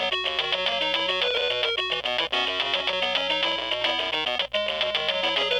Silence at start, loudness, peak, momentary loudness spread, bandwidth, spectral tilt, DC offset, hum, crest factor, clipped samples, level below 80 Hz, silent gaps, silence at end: 0 s; -24 LUFS; -14 dBFS; 2 LU; 17.5 kHz; -2 dB/octave; under 0.1%; 60 Hz at -55 dBFS; 12 dB; under 0.1%; -56 dBFS; none; 0 s